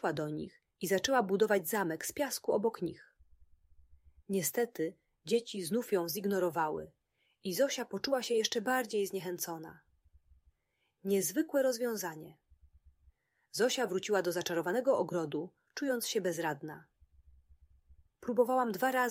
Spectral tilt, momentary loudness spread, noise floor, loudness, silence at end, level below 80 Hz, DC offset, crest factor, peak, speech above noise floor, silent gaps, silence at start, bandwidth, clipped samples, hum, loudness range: -3.5 dB/octave; 13 LU; -81 dBFS; -34 LUFS; 0 s; -70 dBFS; under 0.1%; 20 dB; -16 dBFS; 47 dB; none; 0.05 s; 16 kHz; under 0.1%; none; 3 LU